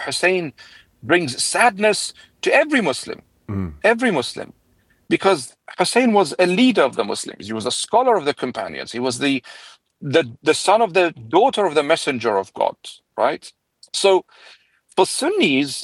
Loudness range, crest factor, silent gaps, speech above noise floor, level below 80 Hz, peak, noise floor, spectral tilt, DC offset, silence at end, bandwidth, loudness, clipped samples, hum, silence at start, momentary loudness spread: 3 LU; 18 dB; none; 41 dB; -58 dBFS; 0 dBFS; -60 dBFS; -3.5 dB/octave; under 0.1%; 0 s; 12.5 kHz; -19 LUFS; under 0.1%; none; 0 s; 13 LU